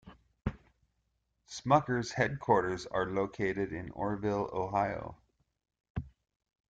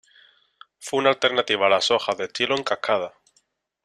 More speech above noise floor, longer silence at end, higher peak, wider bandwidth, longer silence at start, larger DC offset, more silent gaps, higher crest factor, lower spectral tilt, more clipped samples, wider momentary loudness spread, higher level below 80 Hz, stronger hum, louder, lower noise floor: about the same, 47 dB vs 45 dB; second, 0.6 s vs 0.75 s; second, -12 dBFS vs -4 dBFS; second, 9.2 kHz vs 13 kHz; second, 0.05 s vs 0.8 s; neither; first, 5.90-5.95 s vs none; about the same, 24 dB vs 20 dB; first, -6 dB/octave vs -2.5 dB/octave; neither; first, 15 LU vs 8 LU; first, -56 dBFS vs -70 dBFS; neither; second, -33 LUFS vs -22 LUFS; first, -79 dBFS vs -67 dBFS